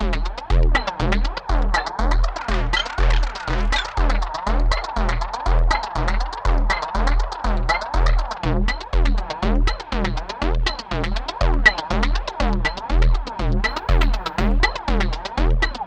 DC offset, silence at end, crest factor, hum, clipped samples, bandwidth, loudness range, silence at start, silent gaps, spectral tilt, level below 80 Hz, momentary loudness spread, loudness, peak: under 0.1%; 0 s; 18 dB; none; under 0.1%; 8.4 kHz; 2 LU; 0 s; none; -5 dB/octave; -20 dBFS; 4 LU; -22 LUFS; 0 dBFS